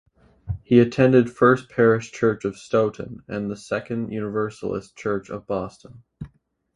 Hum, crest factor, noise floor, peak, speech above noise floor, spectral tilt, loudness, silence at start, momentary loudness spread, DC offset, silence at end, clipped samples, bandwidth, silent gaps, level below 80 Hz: none; 20 dB; -55 dBFS; -2 dBFS; 33 dB; -7.5 dB/octave; -22 LUFS; 0.45 s; 17 LU; under 0.1%; 0.5 s; under 0.1%; 11 kHz; none; -50 dBFS